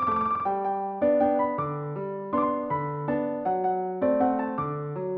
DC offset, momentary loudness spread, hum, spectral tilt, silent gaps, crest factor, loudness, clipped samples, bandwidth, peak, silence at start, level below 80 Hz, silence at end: under 0.1%; 8 LU; none; -8 dB/octave; none; 14 dB; -27 LUFS; under 0.1%; 4.7 kHz; -12 dBFS; 0 s; -60 dBFS; 0 s